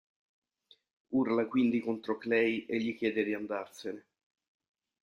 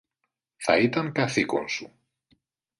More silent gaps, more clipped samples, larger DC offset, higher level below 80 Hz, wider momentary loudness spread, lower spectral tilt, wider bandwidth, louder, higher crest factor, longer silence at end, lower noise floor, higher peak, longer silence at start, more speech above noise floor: neither; neither; neither; second, -76 dBFS vs -64 dBFS; first, 13 LU vs 10 LU; first, -6.5 dB/octave vs -5 dB/octave; about the same, 10.5 kHz vs 11.5 kHz; second, -32 LUFS vs -25 LUFS; about the same, 18 dB vs 22 dB; about the same, 1.05 s vs 0.95 s; second, -67 dBFS vs -81 dBFS; second, -16 dBFS vs -6 dBFS; first, 1.1 s vs 0.6 s; second, 36 dB vs 56 dB